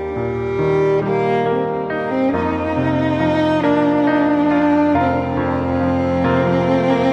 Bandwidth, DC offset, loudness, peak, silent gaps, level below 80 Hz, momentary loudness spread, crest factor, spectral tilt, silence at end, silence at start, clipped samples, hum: 7.8 kHz; under 0.1%; -17 LUFS; -4 dBFS; none; -42 dBFS; 5 LU; 14 dB; -8 dB/octave; 0 s; 0 s; under 0.1%; none